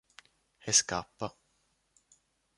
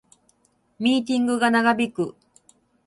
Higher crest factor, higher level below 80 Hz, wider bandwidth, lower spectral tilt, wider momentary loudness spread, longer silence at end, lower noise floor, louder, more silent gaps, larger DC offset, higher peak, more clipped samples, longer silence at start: first, 26 dB vs 18 dB; about the same, -66 dBFS vs -68 dBFS; about the same, 11.5 kHz vs 11.5 kHz; second, -1 dB/octave vs -4.5 dB/octave; first, 16 LU vs 9 LU; first, 1.3 s vs 0.75 s; first, -75 dBFS vs -64 dBFS; second, -29 LUFS vs -22 LUFS; neither; neither; second, -10 dBFS vs -6 dBFS; neither; second, 0.65 s vs 0.8 s